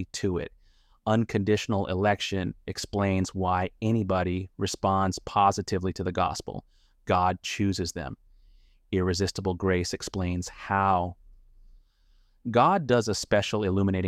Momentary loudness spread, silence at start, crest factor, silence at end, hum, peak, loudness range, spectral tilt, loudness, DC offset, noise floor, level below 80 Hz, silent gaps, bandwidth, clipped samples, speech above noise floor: 10 LU; 0 s; 18 dB; 0 s; none; -10 dBFS; 3 LU; -5.5 dB/octave; -27 LUFS; under 0.1%; -62 dBFS; -50 dBFS; none; 14.5 kHz; under 0.1%; 35 dB